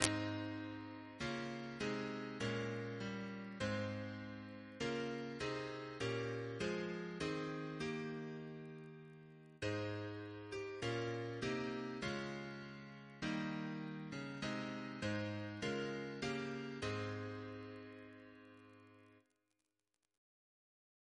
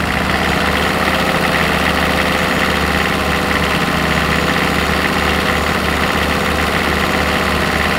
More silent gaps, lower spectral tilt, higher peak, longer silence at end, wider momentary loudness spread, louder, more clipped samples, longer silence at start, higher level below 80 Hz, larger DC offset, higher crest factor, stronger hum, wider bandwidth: neither; about the same, -5 dB/octave vs -4.5 dB/octave; second, -8 dBFS vs 0 dBFS; first, 2 s vs 0 s; first, 12 LU vs 1 LU; second, -44 LUFS vs -14 LUFS; neither; about the same, 0 s vs 0 s; second, -70 dBFS vs -28 dBFS; neither; first, 36 dB vs 16 dB; neither; second, 11 kHz vs 16 kHz